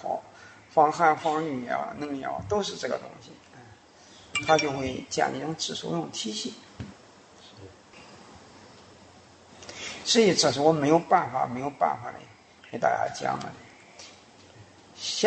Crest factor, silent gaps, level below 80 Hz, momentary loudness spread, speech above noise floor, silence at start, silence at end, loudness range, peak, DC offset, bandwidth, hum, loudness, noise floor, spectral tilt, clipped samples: 22 dB; none; -62 dBFS; 25 LU; 26 dB; 0 s; 0 s; 13 LU; -6 dBFS; under 0.1%; 8.8 kHz; none; -26 LUFS; -53 dBFS; -3.5 dB/octave; under 0.1%